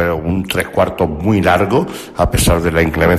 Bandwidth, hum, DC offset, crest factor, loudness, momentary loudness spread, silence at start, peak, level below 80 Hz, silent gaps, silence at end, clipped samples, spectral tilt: 14.5 kHz; none; under 0.1%; 12 dB; -15 LUFS; 5 LU; 0 s; -2 dBFS; -26 dBFS; none; 0 s; under 0.1%; -5.5 dB/octave